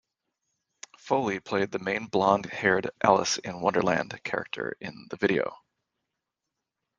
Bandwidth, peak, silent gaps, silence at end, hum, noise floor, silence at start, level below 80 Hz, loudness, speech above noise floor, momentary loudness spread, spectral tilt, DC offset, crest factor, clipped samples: 10 kHz; -4 dBFS; none; 1.45 s; none; -86 dBFS; 1.05 s; -66 dBFS; -27 LUFS; 58 dB; 11 LU; -4 dB/octave; under 0.1%; 24 dB; under 0.1%